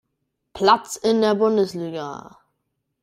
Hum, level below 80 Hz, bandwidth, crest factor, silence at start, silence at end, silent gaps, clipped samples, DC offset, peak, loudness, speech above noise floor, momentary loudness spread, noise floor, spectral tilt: none; -62 dBFS; 15.5 kHz; 20 dB; 0.55 s; 0.8 s; none; under 0.1%; under 0.1%; -2 dBFS; -20 LUFS; 56 dB; 14 LU; -76 dBFS; -4.5 dB/octave